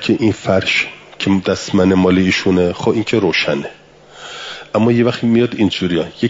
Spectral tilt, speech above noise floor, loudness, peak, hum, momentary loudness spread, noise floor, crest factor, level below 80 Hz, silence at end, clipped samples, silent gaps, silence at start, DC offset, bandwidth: -6 dB/octave; 24 dB; -15 LUFS; -2 dBFS; none; 13 LU; -38 dBFS; 14 dB; -52 dBFS; 0 s; under 0.1%; none; 0 s; under 0.1%; 7.8 kHz